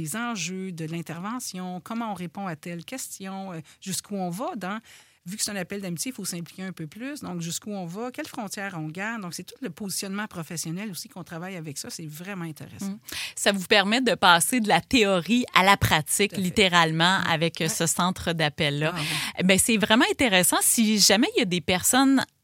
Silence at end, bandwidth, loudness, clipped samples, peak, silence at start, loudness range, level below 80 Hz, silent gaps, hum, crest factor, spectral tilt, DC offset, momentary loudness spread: 0.2 s; 16.5 kHz; -24 LUFS; under 0.1%; 0 dBFS; 0 s; 13 LU; -54 dBFS; none; none; 26 dB; -3 dB/octave; under 0.1%; 17 LU